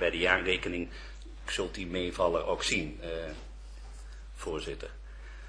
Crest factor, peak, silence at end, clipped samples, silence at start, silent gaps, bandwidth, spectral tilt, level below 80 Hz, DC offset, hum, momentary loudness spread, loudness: 26 dB; -8 dBFS; 0 s; under 0.1%; 0 s; none; 11 kHz; -3.5 dB/octave; -44 dBFS; under 0.1%; none; 21 LU; -32 LUFS